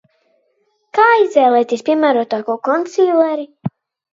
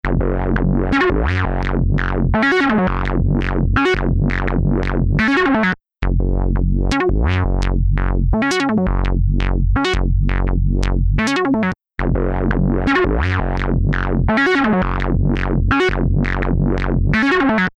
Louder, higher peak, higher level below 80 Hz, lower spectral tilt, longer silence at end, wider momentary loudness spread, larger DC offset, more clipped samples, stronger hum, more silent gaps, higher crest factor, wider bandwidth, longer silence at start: about the same, -15 LUFS vs -17 LUFS; about the same, 0 dBFS vs 0 dBFS; second, -68 dBFS vs -20 dBFS; about the same, -6 dB/octave vs -7 dB/octave; first, 0.45 s vs 0.1 s; first, 12 LU vs 4 LU; neither; neither; neither; neither; about the same, 16 dB vs 16 dB; second, 7.8 kHz vs 8.6 kHz; first, 0.95 s vs 0.05 s